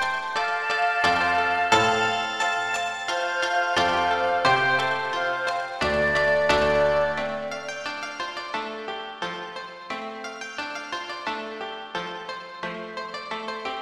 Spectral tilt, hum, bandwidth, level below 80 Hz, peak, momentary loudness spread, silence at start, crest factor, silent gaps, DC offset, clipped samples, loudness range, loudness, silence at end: -3 dB/octave; none; 13 kHz; -52 dBFS; -6 dBFS; 13 LU; 0 s; 20 dB; none; under 0.1%; under 0.1%; 10 LU; -25 LUFS; 0 s